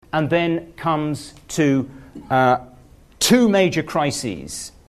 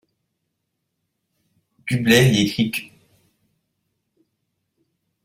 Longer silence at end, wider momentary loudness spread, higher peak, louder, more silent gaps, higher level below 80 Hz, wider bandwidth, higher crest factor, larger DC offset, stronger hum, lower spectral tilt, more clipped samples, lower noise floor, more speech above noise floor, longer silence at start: second, 0.2 s vs 2.4 s; about the same, 14 LU vs 14 LU; about the same, -4 dBFS vs -2 dBFS; about the same, -19 LUFS vs -18 LUFS; neither; about the same, -50 dBFS vs -54 dBFS; second, 13.5 kHz vs 16 kHz; second, 18 dB vs 24 dB; neither; neither; about the same, -4.5 dB/octave vs -5 dB/octave; neither; second, -47 dBFS vs -77 dBFS; second, 28 dB vs 59 dB; second, 0.15 s vs 1.85 s